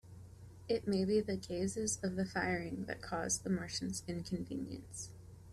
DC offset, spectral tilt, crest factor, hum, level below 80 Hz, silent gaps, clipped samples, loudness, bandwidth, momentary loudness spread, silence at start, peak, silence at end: under 0.1%; -4.5 dB/octave; 16 dB; none; -62 dBFS; none; under 0.1%; -38 LUFS; 13.5 kHz; 15 LU; 0.05 s; -22 dBFS; 0 s